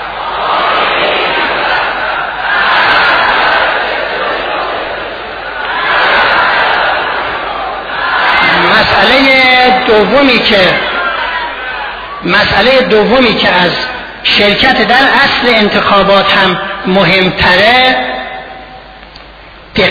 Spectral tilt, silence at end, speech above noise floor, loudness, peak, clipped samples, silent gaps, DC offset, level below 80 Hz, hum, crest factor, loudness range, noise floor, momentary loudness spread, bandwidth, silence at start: -5.5 dB/octave; 0 s; 25 dB; -8 LUFS; 0 dBFS; 0.4%; none; under 0.1%; -36 dBFS; none; 10 dB; 4 LU; -33 dBFS; 12 LU; 5.4 kHz; 0 s